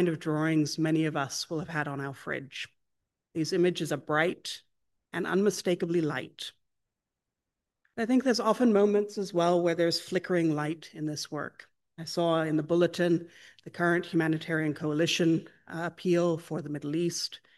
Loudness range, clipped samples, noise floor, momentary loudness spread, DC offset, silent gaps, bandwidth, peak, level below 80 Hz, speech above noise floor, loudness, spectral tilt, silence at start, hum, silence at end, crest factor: 5 LU; under 0.1%; -88 dBFS; 13 LU; under 0.1%; none; 12.5 kHz; -10 dBFS; -76 dBFS; 59 dB; -29 LUFS; -5.5 dB/octave; 0 s; none; 0.2 s; 18 dB